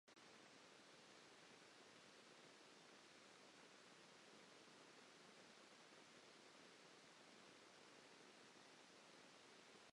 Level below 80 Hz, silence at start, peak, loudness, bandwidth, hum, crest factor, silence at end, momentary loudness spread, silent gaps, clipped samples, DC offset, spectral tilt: under -90 dBFS; 0.05 s; -52 dBFS; -66 LUFS; 11 kHz; none; 14 dB; 0 s; 0 LU; none; under 0.1%; under 0.1%; -2 dB/octave